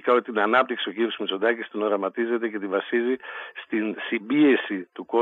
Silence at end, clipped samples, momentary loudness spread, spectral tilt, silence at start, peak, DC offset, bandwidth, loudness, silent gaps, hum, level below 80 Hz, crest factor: 0 s; under 0.1%; 10 LU; -7 dB/octave; 0.05 s; -6 dBFS; under 0.1%; 4.1 kHz; -24 LUFS; none; none; -86 dBFS; 18 dB